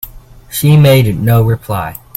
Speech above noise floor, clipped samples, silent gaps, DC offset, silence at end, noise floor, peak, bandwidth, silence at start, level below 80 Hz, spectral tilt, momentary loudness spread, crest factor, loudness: 25 dB; under 0.1%; none; under 0.1%; 0.25 s; -34 dBFS; 0 dBFS; 17 kHz; 0.05 s; -34 dBFS; -6.5 dB/octave; 14 LU; 12 dB; -10 LUFS